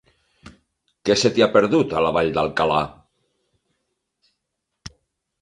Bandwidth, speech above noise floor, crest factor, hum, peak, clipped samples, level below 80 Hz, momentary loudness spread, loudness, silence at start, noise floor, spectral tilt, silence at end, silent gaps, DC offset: 11 kHz; 60 dB; 20 dB; none; -2 dBFS; under 0.1%; -52 dBFS; 26 LU; -19 LUFS; 0.45 s; -79 dBFS; -4.5 dB/octave; 0.55 s; none; under 0.1%